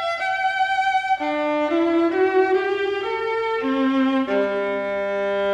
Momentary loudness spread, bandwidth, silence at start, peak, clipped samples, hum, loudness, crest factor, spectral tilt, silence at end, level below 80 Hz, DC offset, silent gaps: 5 LU; 9.2 kHz; 0 s; -8 dBFS; under 0.1%; none; -21 LUFS; 14 dB; -5 dB/octave; 0 s; -60 dBFS; under 0.1%; none